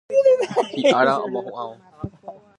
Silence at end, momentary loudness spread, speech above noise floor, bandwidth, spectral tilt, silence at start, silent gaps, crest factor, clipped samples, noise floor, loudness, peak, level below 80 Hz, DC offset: 0.25 s; 19 LU; 22 dB; 11 kHz; -5 dB/octave; 0.1 s; none; 18 dB; under 0.1%; -42 dBFS; -19 LUFS; -4 dBFS; -54 dBFS; under 0.1%